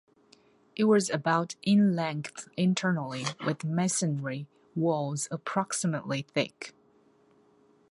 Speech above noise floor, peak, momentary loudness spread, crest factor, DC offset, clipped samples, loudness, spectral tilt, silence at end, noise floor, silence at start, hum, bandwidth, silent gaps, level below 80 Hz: 35 dB; -12 dBFS; 13 LU; 18 dB; under 0.1%; under 0.1%; -29 LUFS; -5 dB/octave; 1.2 s; -63 dBFS; 0.75 s; none; 11.5 kHz; none; -74 dBFS